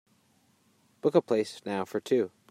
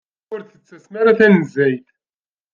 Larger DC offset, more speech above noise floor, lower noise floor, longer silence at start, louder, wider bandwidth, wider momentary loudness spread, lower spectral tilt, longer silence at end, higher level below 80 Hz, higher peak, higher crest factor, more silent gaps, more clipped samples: neither; second, 39 dB vs over 74 dB; second, -67 dBFS vs under -90 dBFS; first, 1.05 s vs 0.3 s; second, -29 LUFS vs -14 LUFS; first, 15.5 kHz vs 7.2 kHz; second, 7 LU vs 20 LU; second, -6 dB/octave vs -8 dB/octave; second, 0.25 s vs 0.75 s; second, -82 dBFS vs -62 dBFS; second, -10 dBFS vs -2 dBFS; about the same, 20 dB vs 16 dB; neither; neither